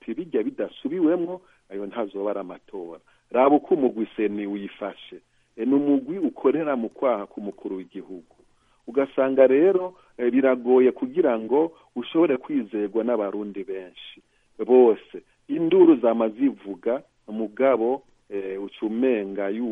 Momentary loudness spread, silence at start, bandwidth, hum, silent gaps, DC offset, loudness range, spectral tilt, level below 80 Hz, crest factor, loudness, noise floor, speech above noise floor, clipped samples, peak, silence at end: 18 LU; 0.05 s; 3.8 kHz; none; none; under 0.1%; 5 LU; -8.5 dB/octave; -70 dBFS; 18 dB; -23 LUFS; -61 dBFS; 38 dB; under 0.1%; -4 dBFS; 0 s